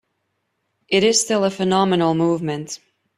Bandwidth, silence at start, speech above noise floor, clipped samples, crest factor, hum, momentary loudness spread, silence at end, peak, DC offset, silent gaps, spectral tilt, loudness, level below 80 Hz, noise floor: 14.5 kHz; 0.9 s; 54 dB; under 0.1%; 18 dB; none; 13 LU; 0.4 s; -2 dBFS; under 0.1%; none; -4 dB/octave; -18 LUFS; -62 dBFS; -73 dBFS